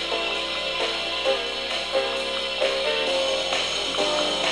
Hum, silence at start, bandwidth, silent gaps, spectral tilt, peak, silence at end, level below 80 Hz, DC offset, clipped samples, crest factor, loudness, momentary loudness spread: none; 0 s; 11 kHz; none; -1 dB/octave; -8 dBFS; 0 s; -52 dBFS; under 0.1%; under 0.1%; 16 dB; -23 LUFS; 3 LU